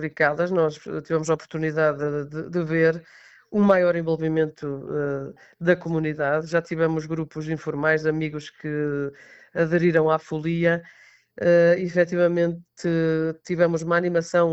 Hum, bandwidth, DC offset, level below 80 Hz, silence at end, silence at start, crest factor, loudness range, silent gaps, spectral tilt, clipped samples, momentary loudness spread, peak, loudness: none; 8.2 kHz; under 0.1%; -60 dBFS; 0 s; 0 s; 16 dB; 4 LU; none; -7 dB/octave; under 0.1%; 10 LU; -6 dBFS; -23 LUFS